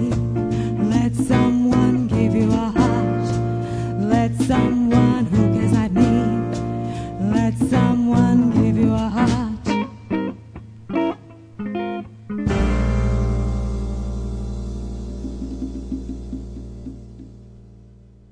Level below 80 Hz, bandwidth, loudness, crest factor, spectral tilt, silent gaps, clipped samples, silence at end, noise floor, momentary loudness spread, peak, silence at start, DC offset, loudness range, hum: -30 dBFS; 11 kHz; -20 LUFS; 16 dB; -8 dB/octave; none; under 0.1%; 0.6 s; -46 dBFS; 14 LU; -2 dBFS; 0 s; under 0.1%; 11 LU; none